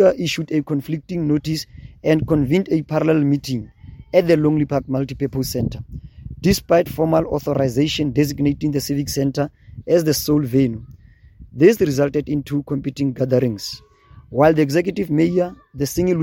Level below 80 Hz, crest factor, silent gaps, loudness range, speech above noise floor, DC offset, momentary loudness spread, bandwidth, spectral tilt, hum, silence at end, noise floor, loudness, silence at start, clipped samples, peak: -42 dBFS; 18 dB; none; 2 LU; 26 dB; under 0.1%; 11 LU; 17 kHz; -6.5 dB/octave; none; 0 s; -44 dBFS; -19 LUFS; 0 s; under 0.1%; 0 dBFS